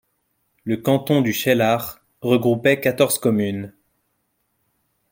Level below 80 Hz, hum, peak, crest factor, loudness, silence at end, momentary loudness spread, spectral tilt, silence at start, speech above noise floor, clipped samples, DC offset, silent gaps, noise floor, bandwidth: -60 dBFS; none; -2 dBFS; 20 dB; -19 LUFS; 1.45 s; 13 LU; -5 dB/octave; 0.65 s; 52 dB; under 0.1%; under 0.1%; none; -71 dBFS; 17 kHz